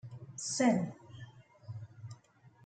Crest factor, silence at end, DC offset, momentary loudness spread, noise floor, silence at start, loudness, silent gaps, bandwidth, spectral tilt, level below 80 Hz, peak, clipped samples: 22 dB; 0.15 s; under 0.1%; 25 LU; -63 dBFS; 0.05 s; -33 LUFS; none; 9.2 kHz; -4.5 dB/octave; -74 dBFS; -16 dBFS; under 0.1%